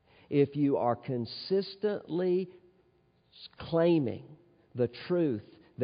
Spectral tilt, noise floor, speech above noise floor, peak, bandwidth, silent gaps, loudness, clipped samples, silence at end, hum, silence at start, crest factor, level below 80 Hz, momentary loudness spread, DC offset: -6.5 dB/octave; -68 dBFS; 38 dB; -14 dBFS; 5.2 kHz; none; -31 LUFS; under 0.1%; 0 s; none; 0.3 s; 18 dB; -70 dBFS; 17 LU; under 0.1%